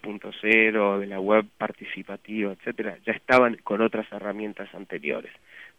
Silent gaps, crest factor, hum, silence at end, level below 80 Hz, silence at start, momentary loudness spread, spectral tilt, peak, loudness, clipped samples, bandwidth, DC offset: none; 22 dB; none; 0.1 s; -66 dBFS; 0.05 s; 17 LU; -6.5 dB/octave; -4 dBFS; -25 LUFS; under 0.1%; 11.5 kHz; under 0.1%